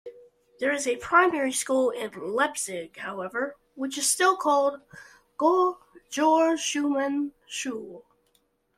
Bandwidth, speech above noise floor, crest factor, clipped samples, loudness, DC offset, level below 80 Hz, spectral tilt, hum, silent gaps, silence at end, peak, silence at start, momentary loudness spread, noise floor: 16 kHz; 44 dB; 20 dB; under 0.1%; -26 LUFS; under 0.1%; -70 dBFS; -2 dB/octave; none; none; 0.75 s; -6 dBFS; 0.05 s; 14 LU; -69 dBFS